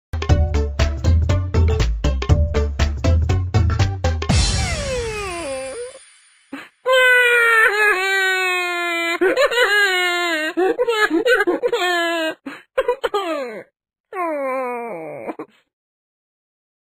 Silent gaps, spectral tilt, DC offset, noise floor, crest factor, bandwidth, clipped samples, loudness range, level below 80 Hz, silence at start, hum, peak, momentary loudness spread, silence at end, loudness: 14.00-14.04 s; -5 dB/octave; under 0.1%; -51 dBFS; 18 dB; 15.5 kHz; under 0.1%; 10 LU; -26 dBFS; 0.15 s; none; -2 dBFS; 17 LU; 1.5 s; -18 LUFS